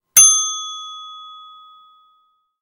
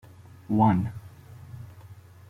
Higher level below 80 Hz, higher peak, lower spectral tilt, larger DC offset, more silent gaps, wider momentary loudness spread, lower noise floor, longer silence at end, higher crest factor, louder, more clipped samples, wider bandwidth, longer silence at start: second, -70 dBFS vs -60 dBFS; first, 0 dBFS vs -8 dBFS; second, 4 dB/octave vs -9.5 dB/octave; neither; neither; about the same, 26 LU vs 25 LU; first, -62 dBFS vs -48 dBFS; first, 1.35 s vs 0.35 s; about the same, 20 dB vs 22 dB; first, -12 LUFS vs -25 LUFS; neither; first, 17 kHz vs 14 kHz; second, 0.15 s vs 0.5 s